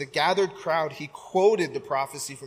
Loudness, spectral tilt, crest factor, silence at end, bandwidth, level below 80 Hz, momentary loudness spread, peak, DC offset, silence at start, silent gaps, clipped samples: -25 LUFS; -4 dB/octave; 16 dB; 0 s; 15.5 kHz; -70 dBFS; 10 LU; -10 dBFS; under 0.1%; 0 s; none; under 0.1%